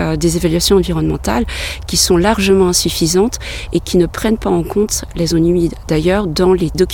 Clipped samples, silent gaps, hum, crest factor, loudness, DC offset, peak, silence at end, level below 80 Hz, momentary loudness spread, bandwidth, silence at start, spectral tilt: under 0.1%; none; none; 14 dB; -14 LUFS; 0.1%; 0 dBFS; 0 s; -28 dBFS; 6 LU; 17.5 kHz; 0 s; -4.5 dB/octave